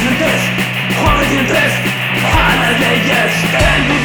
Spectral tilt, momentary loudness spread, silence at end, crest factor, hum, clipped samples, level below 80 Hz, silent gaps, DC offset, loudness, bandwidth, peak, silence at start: -4.5 dB/octave; 4 LU; 0 s; 12 dB; none; under 0.1%; -26 dBFS; none; 0.3%; -12 LUFS; over 20 kHz; 0 dBFS; 0 s